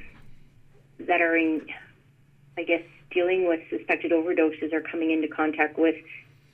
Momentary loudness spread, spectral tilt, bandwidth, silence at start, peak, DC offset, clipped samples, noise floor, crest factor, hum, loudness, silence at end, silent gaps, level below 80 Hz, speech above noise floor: 17 LU; -7 dB/octave; 3.7 kHz; 0 s; -8 dBFS; under 0.1%; under 0.1%; -58 dBFS; 18 dB; none; -25 LUFS; 0.35 s; none; -60 dBFS; 33 dB